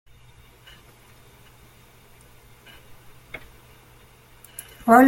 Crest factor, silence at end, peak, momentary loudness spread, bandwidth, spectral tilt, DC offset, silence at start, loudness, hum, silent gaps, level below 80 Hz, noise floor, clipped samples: 24 dB; 0 s; -2 dBFS; 11 LU; 16.5 kHz; -5.5 dB/octave; under 0.1%; 4.85 s; -26 LUFS; none; none; -56 dBFS; -52 dBFS; under 0.1%